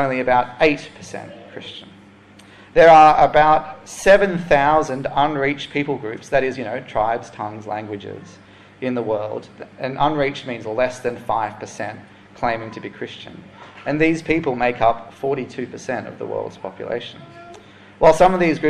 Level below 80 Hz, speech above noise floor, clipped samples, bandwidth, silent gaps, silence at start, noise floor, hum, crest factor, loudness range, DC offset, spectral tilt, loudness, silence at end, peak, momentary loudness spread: -44 dBFS; 27 dB; under 0.1%; 12.5 kHz; none; 0 s; -46 dBFS; none; 18 dB; 11 LU; under 0.1%; -5.5 dB/octave; -18 LUFS; 0 s; -2 dBFS; 20 LU